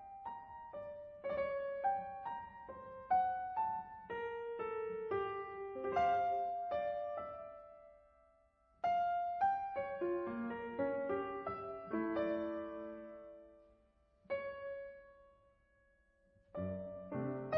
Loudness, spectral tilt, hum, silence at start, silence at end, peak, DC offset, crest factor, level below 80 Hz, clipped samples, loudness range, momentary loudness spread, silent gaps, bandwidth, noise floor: -40 LUFS; -5 dB/octave; none; 0 s; 0 s; -24 dBFS; under 0.1%; 16 dB; -70 dBFS; under 0.1%; 9 LU; 15 LU; none; 6.2 kHz; -73 dBFS